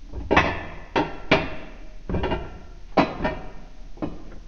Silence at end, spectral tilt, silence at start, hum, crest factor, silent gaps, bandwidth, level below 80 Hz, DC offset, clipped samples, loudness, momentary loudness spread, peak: 0 s; -6 dB/octave; 0 s; none; 24 dB; none; 7.2 kHz; -36 dBFS; under 0.1%; under 0.1%; -25 LUFS; 20 LU; -2 dBFS